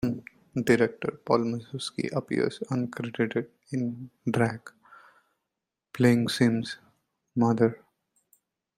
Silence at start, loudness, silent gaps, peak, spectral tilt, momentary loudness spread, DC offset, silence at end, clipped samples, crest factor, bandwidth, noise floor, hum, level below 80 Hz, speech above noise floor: 0 s; -28 LUFS; none; -8 dBFS; -6.5 dB/octave; 12 LU; under 0.1%; 1 s; under 0.1%; 20 dB; 16 kHz; -86 dBFS; none; -64 dBFS; 59 dB